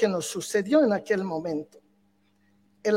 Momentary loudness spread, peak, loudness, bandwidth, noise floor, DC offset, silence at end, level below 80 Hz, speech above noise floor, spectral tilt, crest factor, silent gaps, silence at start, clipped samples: 11 LU; -8 dBFS; -26 LUFS; 16.5 kHz; -66 dBFS; under 0.1%; 0 s; -74 dBFS; 41 dB; -5 dB/octave; 18 dB; none; 0 s; under 0.1%